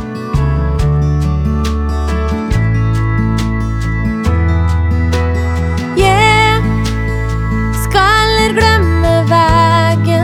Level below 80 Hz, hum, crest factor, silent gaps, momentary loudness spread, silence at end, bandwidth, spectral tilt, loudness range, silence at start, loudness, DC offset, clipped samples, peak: -18 dBFS; none; 12 dB; none; 7 LU; 0 s; 15 kHz; -6 dB/octave; 4 LU; 0 s; -13 LUFS; under 0.1%; under 0.1%; 0 dBFS